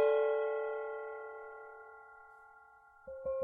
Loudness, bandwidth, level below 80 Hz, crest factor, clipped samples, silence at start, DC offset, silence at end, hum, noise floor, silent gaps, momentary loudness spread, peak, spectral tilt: -37 LUFS; 3.7 kHz; -74 dBFS; 18 dB; under 0.1%; 0 s; under 0.1%; 0 s; none; -61 dBFS; none; 24 LU; -20 dBFS; -6 dB/octave